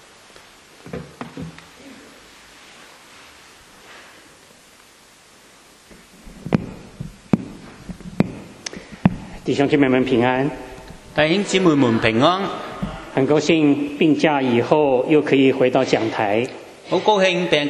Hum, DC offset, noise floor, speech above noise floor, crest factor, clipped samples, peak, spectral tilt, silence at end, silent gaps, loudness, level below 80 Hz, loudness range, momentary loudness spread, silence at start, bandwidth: none; under 0.1%; -49 dBFS; 32 dB; 20 dB; under 0.1%; 0 dBFS; -6 dB/octave; 0 s; none; -18 LUFS; -48 dBFS; 21 LU; 20 LU; 0.85 s; 12 kHz